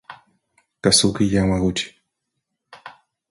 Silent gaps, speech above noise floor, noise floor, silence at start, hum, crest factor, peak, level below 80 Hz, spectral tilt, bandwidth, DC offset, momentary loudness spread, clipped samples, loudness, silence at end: none; 60 dB; -78 dBFS; 0.1 s; none; 20 dB; -2 dBFS; -42 dBFS; -4 dB/octave; 11.5 kHz; under 0.1%; 11 LU; under 0.1%; -18 LUFS; 0.4 s